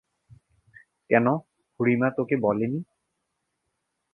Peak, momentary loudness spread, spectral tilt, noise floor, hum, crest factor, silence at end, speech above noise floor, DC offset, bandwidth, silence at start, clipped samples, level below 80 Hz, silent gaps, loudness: -4 dBFS; 9 LU; -10.5 dB/octave; -79 dBFS; none; 24 dB; 1.3 s; 56 dB; under 0.1%; 3.5 kHz; 1.1 s; under 0.1%; -68 dBFS; none; -25 LUFS